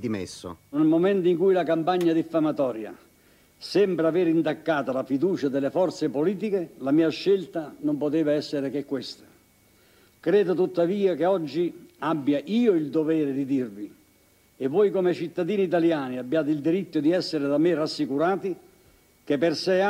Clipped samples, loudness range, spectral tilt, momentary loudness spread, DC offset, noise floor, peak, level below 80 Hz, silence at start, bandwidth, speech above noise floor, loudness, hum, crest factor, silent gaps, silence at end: under 0.1%; 2 LU; -7 dB/octave; 10 LU; under 0.1%; -60 dBFS; -10 dBFS; -70 dBFS; 0 s; 15 kHz; 36 dB; -25 LUFS; none; 14 dB; none; 0 s